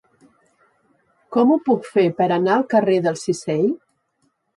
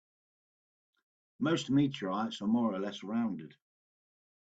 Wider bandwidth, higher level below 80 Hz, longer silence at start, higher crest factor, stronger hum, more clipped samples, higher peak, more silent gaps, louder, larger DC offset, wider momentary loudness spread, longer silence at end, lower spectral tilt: first, 11.5 kHz vs 8 kHz; first, -68 dBFS vs -74 dBFS; about the same, 1.3 s vs 1.4 s; about the same, 16 dB vs 16 dB; neither; neither; first, -6 dBFS vs -18 dBFS; neither; first, -19 LUFS vs -33 LUFS; neither; about the same, 6 LU vs 8 LU; second, 0.8 s vs 1.05 s; about the same, -6.5 dB/octave vs -6 dB/octave